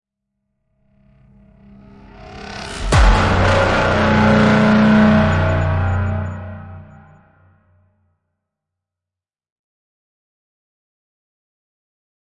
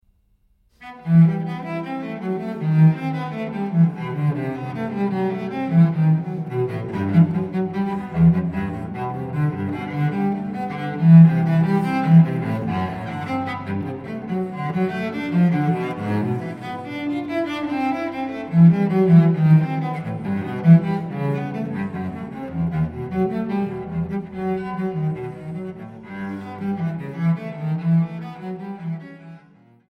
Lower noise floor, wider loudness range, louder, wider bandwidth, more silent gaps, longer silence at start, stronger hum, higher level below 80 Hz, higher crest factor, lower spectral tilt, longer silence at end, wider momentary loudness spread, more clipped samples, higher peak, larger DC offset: first, -88 dBFS vs -61 dBFS; first, 12 LU vs 8 LU; first, -14 LUFS vs -21 LUFS; first, 11 kHz vs 5 kHz; neither; first, 2.2 s vs 0.8 s; neither; first, -28 dBFS vs -52 dBFS; about the same, 18 dB vs 18 dB; second, -6.5 dB/octave vs -10 dB/octave; first, 5.4 s vs 0.5 s; first, 20 LU vs 15 LU; neither; about the same, -2 dBFS vs -2 dBFS; neither